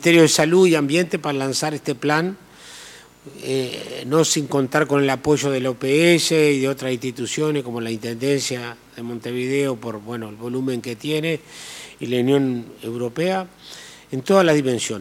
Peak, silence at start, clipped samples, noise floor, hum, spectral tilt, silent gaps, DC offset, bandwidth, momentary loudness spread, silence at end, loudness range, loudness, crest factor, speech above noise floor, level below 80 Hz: -4 dBFS; 0 s; under 0.1%; -43 dBFS; none; -4.5 dB/octave; none; under 0.1%; 17 kHz; 19 LU; 0 s; 7 LU; -20 LUFS; 18 dB; 23 dB; -62 dBFS